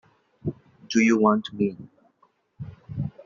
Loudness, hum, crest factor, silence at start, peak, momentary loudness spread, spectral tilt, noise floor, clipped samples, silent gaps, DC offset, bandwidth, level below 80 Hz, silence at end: -24 LUFS; none; 20 dB; 0.45 s; -6 dBFS; 23 LU; -5.5 dB/octave; -65 dBFS; under 0.1%; none; under 0.1%; 7.4 kHz; -60 dBFS; 0.05 s